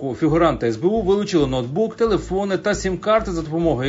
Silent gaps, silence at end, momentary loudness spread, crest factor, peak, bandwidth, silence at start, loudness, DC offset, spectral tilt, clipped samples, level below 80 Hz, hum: none; 0 s; 5 LU; 16 dB; -4 dBFS; 7.8 kHz; 0 s; -20 LUFS; under 0.1%; -6 dB/octave; under 0.1%; -38 dBFS; none